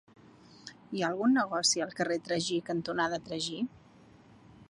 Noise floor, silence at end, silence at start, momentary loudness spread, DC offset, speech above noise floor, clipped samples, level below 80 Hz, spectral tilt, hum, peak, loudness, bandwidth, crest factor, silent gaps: -58 dBFS; 0.05 s; 0.5 s; 13 LU; under 0.1%; 27 dB; under 0.1%; -70 dBFS; -3 dB/octave; none; -14 dBFS; -31 LUFS; 11.5 kHz; 18 dB; none